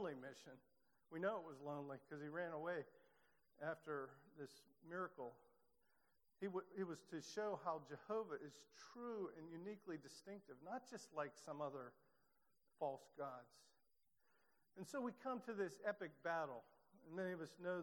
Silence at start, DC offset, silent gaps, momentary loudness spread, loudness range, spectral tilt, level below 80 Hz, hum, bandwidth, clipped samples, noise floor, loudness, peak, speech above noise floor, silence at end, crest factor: 0 s; under 0.1%; none; 13 LU; 5 LU; -5.5 dB/octave; under -90 dBFS; none; 19 kHz; under 0.1%; -86 dBFS; -51 LUFS; -30 dBFS; 36 dB; 0 s; 22 dB